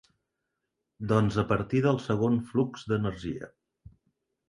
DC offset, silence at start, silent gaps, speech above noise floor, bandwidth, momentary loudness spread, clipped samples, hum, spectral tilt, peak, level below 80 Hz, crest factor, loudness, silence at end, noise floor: under 0.1%; 1 s; none; 56 dB; 11 kHz; 13 LU; under 0.1%; none; -8 dB/octave; -10 dBFS; -54 dBFS; 20 dB; -28 LUFS; 1.05 s; -83 dBFS